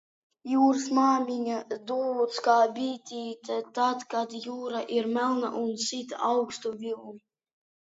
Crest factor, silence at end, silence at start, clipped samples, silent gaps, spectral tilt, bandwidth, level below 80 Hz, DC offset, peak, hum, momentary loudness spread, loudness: 18 dB; 0.75 s; 0.45 s; under 0.1%; none; -3.5 dB/octave; 8 kHz; -82 dBFS; under 0.1%; -10 dBFS; none; 13 LU; -28 LUFS